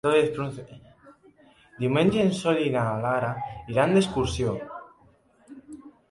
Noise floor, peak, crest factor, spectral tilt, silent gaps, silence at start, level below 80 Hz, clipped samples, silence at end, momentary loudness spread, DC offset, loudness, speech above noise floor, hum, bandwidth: -59 dBFS; -8 dBFS; 18 dB; -6 dB/octave; none; 0.05 s; -50 dBFS; under 0.1%; 0.2 s; 21 LU; under 0.1%; -25 LUFS; 35 dB; none; 11.5 kHz